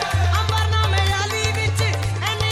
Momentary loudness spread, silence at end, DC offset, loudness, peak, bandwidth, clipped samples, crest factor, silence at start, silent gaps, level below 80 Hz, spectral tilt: 3 LU; 0 s; under 0.1%; -20 LUFS; -6 dBFS; 15 kHz; under 0.1%; 14 dB; 0 s; none; -32 dBFS; -4 dB/octave